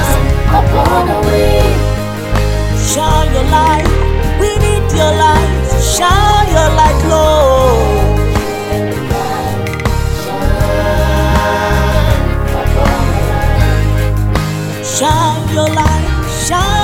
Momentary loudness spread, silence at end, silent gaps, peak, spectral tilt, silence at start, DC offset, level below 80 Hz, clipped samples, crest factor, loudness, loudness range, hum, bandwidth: 7 LU; 0 s; none; 0 dBFS; -5 dB/octave; 0 s; under 0.1%; -16 dBFS; under 0.1%; 10 dB; -12 LUFS; 4 LU; none; 17 kHz